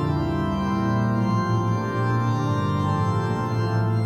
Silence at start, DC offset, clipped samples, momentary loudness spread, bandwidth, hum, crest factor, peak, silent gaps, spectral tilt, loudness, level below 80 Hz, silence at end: 0 s; under 0.1%; under 0.1%; 2 LU; 8.4 kHz; none; 10 dB; -12 dBFS; none; -8 dB/octave; -23 LUFS; -46 dBFS; 0 s